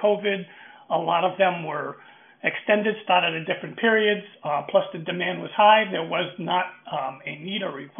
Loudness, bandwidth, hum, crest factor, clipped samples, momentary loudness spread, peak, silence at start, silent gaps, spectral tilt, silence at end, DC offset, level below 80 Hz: -24 LUFS; 3.7 kHz; none; 20 dB; under 0.1%; 11 LU; -4 dBFS; 0 s; none; -2 dB/octave; 0 s; under 0.1%; -76 dBFS